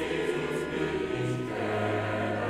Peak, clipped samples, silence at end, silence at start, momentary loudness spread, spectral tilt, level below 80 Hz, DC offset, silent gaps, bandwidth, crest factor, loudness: -16 dBFS; under 0.1%; 0 s; 0 s; 2 LU; -6 dB/octave; -54 dBFS; under 0.1%; none; 14.5 kHz; 14 dB; -30 LUFS